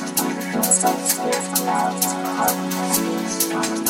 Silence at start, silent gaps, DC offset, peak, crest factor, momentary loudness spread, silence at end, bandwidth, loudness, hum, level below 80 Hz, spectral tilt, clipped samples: 0 s; none; under 0.1%; -4 dBFS; 18 dB; 6 LU; 0 s; 16.5 kHz; -20 LUFS; none; -60 dBFS; -2.5 dB/octave; under 0.1%